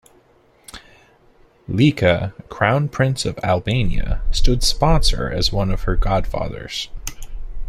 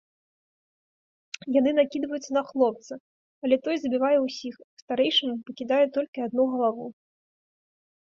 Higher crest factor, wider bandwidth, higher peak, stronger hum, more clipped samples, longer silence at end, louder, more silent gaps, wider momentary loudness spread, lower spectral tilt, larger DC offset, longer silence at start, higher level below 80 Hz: about the same, 18 dB vs 18 dB; first, 14.5 kHz vs 7.6 kHz; first, -2 dBFS vs -8 dBFS; neither; neither; second, 0 s vs 1.2 s; first, -20 LUFS vs -25 LUFS; second, none vs 3.00-3.42 s, 4.64-4.88 s, 6.08-6.13 s; about the same, 16 LU vs 16 LU; about the same, -5 dB/octave vs -4 dB/octave; neither; second, 0.75 s vs 1.45 s; first, -24 dBFS vs -72 dBFS